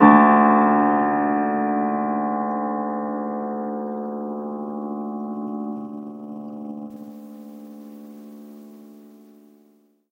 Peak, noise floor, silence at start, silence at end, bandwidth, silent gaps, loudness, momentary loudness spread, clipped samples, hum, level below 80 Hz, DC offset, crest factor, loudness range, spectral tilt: 0 dBFS; -59 dBFS; 0 s; 1.1 s; 3.7 kHz; none; -21 LUFS; 24 LU; under 0.1%; none; -70 dBFS; under 0.1%; 22 dB; 18 LU; -9.5 dB/octave